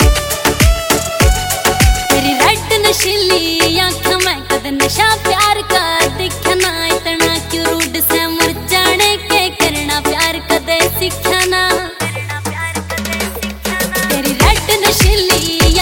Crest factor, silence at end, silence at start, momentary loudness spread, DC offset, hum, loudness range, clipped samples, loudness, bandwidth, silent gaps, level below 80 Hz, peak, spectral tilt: 14 dB; 0 s; 0 s; 7 LU; under 0.1%; none; 3 LU; under 0.1%; -12 LUFS; 17.5 kHz; none; -22 dBFS; 0 dBFS; -3 dB/octave